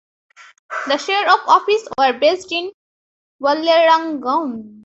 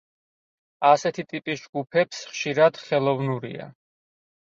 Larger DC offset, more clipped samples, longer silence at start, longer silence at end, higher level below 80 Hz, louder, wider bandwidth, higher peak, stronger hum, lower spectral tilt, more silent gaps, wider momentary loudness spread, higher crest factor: neither; neither; about the same, 0.7 s vs 0.8 s; second, 0.15 s vs 0.9 s; about the same, -66 dBFS vs -70 dBFS; first, -16 LUFS vs -24 LUFS; about the same, 8.2 kHz vs 7.8 kHz; first, 0 dBFS vs -4 dBFS; neither; second, -2.5 dB/octave vs -5 dB/octave; first, 2.74-3.39 s vs 1.69-1.73 s; about the same, 12 LU vs 12 LU; second, 16 dB vs 22 dB